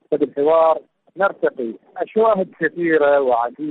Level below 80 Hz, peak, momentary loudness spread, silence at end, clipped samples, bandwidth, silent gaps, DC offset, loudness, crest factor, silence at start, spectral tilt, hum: -64 dBFS; -6 dBFS; 9 LU; 0 s; under 0.1%; 4.1 kHz; none; under 0.1%; -18 LUFS; 12 dB; 0.1 s; -9 dB/octave; none